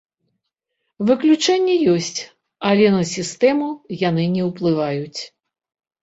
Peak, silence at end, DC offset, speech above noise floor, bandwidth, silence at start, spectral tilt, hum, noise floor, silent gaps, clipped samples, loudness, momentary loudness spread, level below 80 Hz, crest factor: -2 dBFS; 0.75 s; under 0.1%; 59 dB; 8 kHz; 1 s; -5.5 dB/octave; none; -77 dBFS; none; under 0.1%; -18 LUFS; 13 LU; -62 dBFS; 16 dB